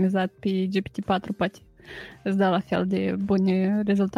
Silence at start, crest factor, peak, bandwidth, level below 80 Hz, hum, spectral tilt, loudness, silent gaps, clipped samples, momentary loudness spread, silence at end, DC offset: 0 s; 14 dB; -10 dBFS; 7 kHz; -56 dBFS; none; -8 dB/octave; -25 LUFS; none; under 0.1%; 9 LU; 0 s; under 0.1%